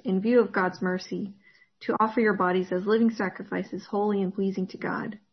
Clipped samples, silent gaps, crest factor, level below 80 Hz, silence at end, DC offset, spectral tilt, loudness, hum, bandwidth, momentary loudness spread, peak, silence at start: under 0.1%; none; 16 dB; -72 dBFS; 0.15 s; under 0.1%; -7.5 dB/octave; -27 LUFS; none; 6.4 kHz; 11 LU; -10 dBFS; 0.05 s